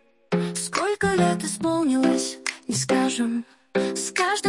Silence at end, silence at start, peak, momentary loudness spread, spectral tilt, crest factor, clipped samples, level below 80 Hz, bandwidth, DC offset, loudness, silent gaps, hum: 0 s; 0.3 s; -8 dBFS; 7 LU; -4 dB/octave; 16 dB; under 0.1%; -60 dBFS; 11.5 kHz; under 0.1%; -24 LUFS; none; none